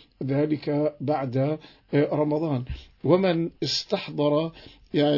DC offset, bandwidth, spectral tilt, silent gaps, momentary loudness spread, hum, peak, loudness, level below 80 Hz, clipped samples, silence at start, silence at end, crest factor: under 0.1%; 6 kHz; -6.5 dB/octave; none; 8 LU; none; -8 dBFS; -26 LUFS; -52 dBFS; under 0.1%; 0.2 s; 0 s; 18 dB